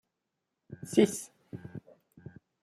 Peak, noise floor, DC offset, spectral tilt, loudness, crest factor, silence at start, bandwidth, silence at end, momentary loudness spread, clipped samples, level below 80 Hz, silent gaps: -10 dBFS; -85 dBFS; under 0.1%; -5 dB/octave; -29 LUFS; 24 dB; 0.7 s; 14.5 kHz; 0.35 s; 26 LU; under 0.1%; -72 dBFS; none